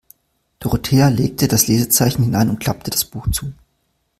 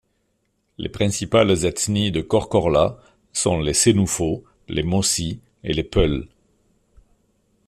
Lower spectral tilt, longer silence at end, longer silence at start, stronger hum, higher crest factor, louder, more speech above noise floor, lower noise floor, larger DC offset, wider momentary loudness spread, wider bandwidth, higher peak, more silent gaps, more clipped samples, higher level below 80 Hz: about the same, -4.5 dB/octave vs -4.5 dB/octave; second, 0.65 s vs 1.4 s; second, 0.6 s vs 0.8 s; neither; about the same, 18 dB vs 18 dB; first, -17 LUFS vs -20 LUFS; about the same, 51 dB vs 49 dB; about the same, -67 dBFS vs -69 dBFS; neither; second, 9 LU vs 12 LU; about the same, 16 kHz vs 15 kHz; first, 0 dBFS vs -4 dBFS; neither; neither; about the same, -36 dBFS vs -38 dBFS